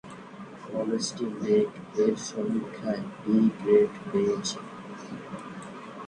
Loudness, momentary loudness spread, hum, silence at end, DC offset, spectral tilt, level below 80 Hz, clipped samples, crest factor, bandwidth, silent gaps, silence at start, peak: -27 LUFS; 18 LU; none; 0 s; under 0.1%; -5.5 dB/octave; -66 dBFS; under 0.1%; 20 dB; 10 kHz; none; 0.05 s; -8 dBFS